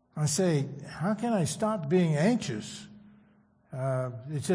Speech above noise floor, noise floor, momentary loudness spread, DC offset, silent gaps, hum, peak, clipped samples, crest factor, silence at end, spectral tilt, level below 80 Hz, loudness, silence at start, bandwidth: 35 dB; -63 dBFS; 12 LU; under 0.1%; none; none; -14 dBFS; under 0.1%; 14 dB; 0 s; -6 dB/octave; -66 dBFS; -29 LUFS; 0.15 s; 10.5 kHz